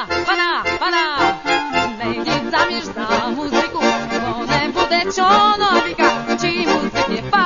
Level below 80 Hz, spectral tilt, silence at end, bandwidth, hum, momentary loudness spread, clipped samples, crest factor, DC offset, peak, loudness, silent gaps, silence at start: -44 dBFS; -3.5 dB/octave; 0 s; 7.4 kHz; none; 6 LU; under 0.1%; 16 dB; 0.4%; -2 dBFS; -17 LUFS; none; 0 s